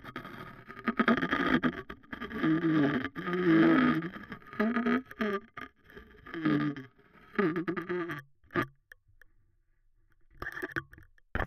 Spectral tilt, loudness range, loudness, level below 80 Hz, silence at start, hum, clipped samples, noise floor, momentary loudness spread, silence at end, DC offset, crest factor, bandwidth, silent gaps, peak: -7.5 dB/octave; 11 LU; -31 LUFS; -56 dBFS; 0.05 s; none; under 0.1%; -68 dBFS; 18 LU; 0 s; under 0.1%; 20 dB; 14 kHz; none; -12 dBFS